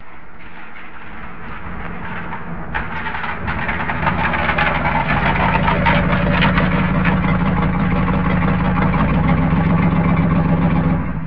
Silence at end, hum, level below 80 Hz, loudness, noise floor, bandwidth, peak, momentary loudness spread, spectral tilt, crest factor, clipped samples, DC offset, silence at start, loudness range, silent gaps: 0 s; none; -28 dBFS; -17 LUFS; -38 dBFS; 5.4 kHz; -2 dBFS; 17 LU; -9.5 dB/octave; 16 dB; under 0.1%; 4%; 0 s; 10 LU; none